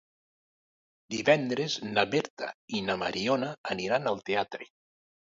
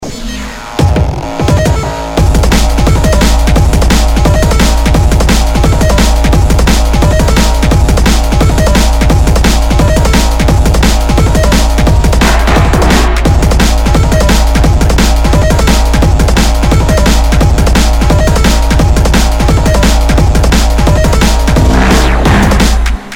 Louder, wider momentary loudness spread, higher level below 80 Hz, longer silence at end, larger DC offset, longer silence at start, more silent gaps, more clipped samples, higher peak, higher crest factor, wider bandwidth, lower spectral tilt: second, -29 LUFS vs -9 LUFS; first, 12 LU vs 2 LU; second, -68 dBFS vs -8 dBFS; first, 0.65 s vs 0 s; neither; first, 1.1 s vs 0 s; first, 2.30-2.37 s, 2.54-2.68 s, 3.58-3.64 s vs none; second, under 0.1% vs 1%; second, -8 dBFS vs 0 dBFS; first, 22 dB vs 6 dB; second, 7.8 kHz vs 16.5 kHz; about the same, -4.5 dB/octave vs -5 dB/octave